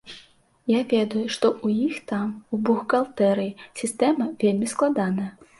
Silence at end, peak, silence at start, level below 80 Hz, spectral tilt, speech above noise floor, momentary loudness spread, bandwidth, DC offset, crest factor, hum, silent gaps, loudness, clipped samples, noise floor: 0.3 s; -6 dBFS; 0.05 s; -66 dBFS; -5.5 dB/octave; 31 dB; 9 LU; 11.5 kHz; under 0.1%; 18 dB; none; none; -24 LUFS; under 0.1%; -54 dBFS